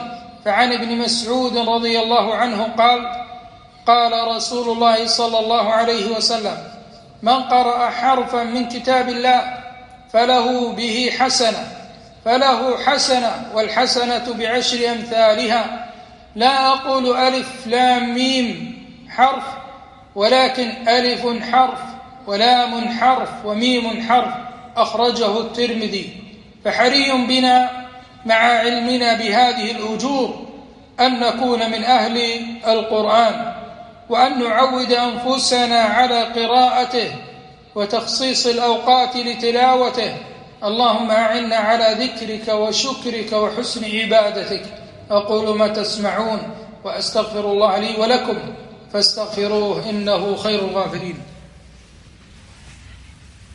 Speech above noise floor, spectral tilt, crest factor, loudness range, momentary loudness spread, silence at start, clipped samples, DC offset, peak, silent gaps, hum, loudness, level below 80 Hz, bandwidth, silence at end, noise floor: 27 dB; -3 dB/octave; 18 dB; 3 LU; 13 LU; 0 s; under 0.1%; under 0.1%; 0 dBFS; none; none; -17 LUFS; -54 dBFS; 11.5 kHz; 0.1 s; -44 dBFS